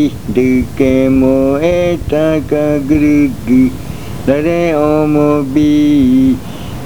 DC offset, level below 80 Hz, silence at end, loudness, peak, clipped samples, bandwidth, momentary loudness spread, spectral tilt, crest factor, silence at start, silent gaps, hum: 3%; -30 dBFS; 0 s; -11 LUFS; 0 dBFS; under 0.1%; 20 kHz; 5 LU; -7.5 dB/octave; 12 dB; 0 s; none; none